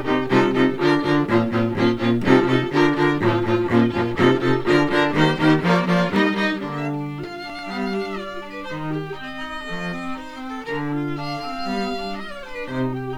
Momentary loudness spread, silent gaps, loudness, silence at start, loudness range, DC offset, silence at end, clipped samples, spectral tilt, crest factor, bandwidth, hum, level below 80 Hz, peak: 14 LU; none; -21 LUFS; 0 s; 10 LU; under 0.1%; 0 s; under 0.1%; -7 dB/octave; 18 dB; 12.5 kHz; none; -48 dBFS; -2 dBFS